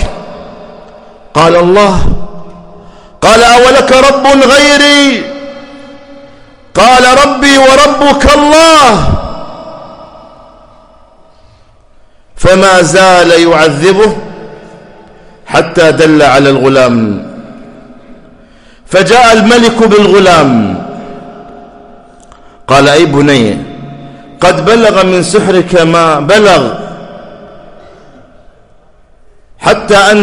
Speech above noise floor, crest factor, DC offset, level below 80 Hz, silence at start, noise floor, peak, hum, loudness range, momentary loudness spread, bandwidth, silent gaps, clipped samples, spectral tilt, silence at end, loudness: 36 dB; 8 dB; under 0.1%; -26 dBFS; 0 s; -40 dBFS; 0 dBFS; none; 6 LU; 21 LU; 19 kHz; none; 2%; -4 dB/octave; 0 s; -5 LUFS